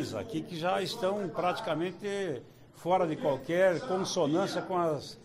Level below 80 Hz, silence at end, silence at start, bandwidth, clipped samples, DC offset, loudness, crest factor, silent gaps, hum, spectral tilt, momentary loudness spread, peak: -66 dBFS; 0 s; 0 s; 15.5 kHz; under 0.1%; under 0.1%; -31 LUFS; 16 dB; none; none; -5 dB/octave; 8 LU; -16 dBFS